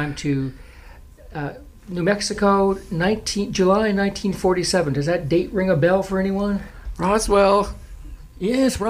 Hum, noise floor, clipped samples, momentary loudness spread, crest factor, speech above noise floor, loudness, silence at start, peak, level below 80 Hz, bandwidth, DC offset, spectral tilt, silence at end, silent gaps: none; -43 dBFS; under 0.1%; 13 LU; 16 dB; 23 dB; -20 LUFS; 0 s; -6 dBFS; -38 dBFS; 15.5 kHz; under 0.1%; -5.5 dB/octave; 0 s; none